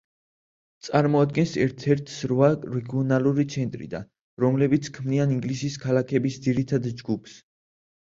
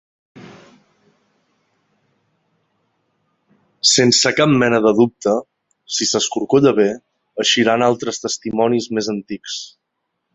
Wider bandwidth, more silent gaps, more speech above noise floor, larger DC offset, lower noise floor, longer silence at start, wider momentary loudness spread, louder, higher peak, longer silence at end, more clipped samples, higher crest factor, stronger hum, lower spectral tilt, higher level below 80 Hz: about the same, 7.8 kHz vs 8.4 kHz; first, 4.21-4.37 s vs none; first, over 66 dB vs 59 dB; neither; first, under -90 dBFS vs -75 dBFS; first, 0.85 s vs 0.35 s; second, 10 LU vs 14 LU; second, -24 LUFS vs -16 LUFS; second, -6 dBFS vs 0 dBFS; about the same, 0.65 s vs 0.65 s; neither; about the same, 20 dB vs 18 dB; neither; first, -7 dB/octave vs -3.5 dB/octave; about the same, -58 dBFS vs -58 dBFS